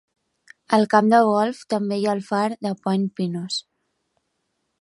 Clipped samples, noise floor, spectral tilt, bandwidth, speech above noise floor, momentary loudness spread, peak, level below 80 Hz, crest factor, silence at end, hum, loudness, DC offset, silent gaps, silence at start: under 0.1%; -74 dBFS; -6 dB/octave; 11.5 kHz; 54 dB; 11 LU; -2 dBFS; -74 dBFS; 20 dB; 1.2 s; none; -21 LUFS; under 0.1%; none; 0.7 s